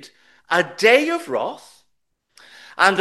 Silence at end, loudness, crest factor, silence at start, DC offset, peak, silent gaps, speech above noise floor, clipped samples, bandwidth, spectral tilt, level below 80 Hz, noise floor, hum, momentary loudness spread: 0 s; -18 LUFS; 22 dB; 0.05 s; under 0.1%; 0 dBFS; none; 52 dB; under 0.1%; 12.5 kHz; -3 dB/octave; -70 dBFS; -71 dBFS; none; 18 LU